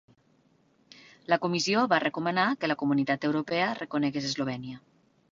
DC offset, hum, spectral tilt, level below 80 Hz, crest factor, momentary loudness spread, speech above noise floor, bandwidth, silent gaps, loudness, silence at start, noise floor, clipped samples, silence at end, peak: under 0.1%; none; -4.5 dB/octave; -70 dBFS; 20 dB; 9 LU; 38 dB; 7.6 kHz; none; -28 LUFS; 1.3 s; -66 dBFS; under 0.1%; 0.55 s; -10 dBFS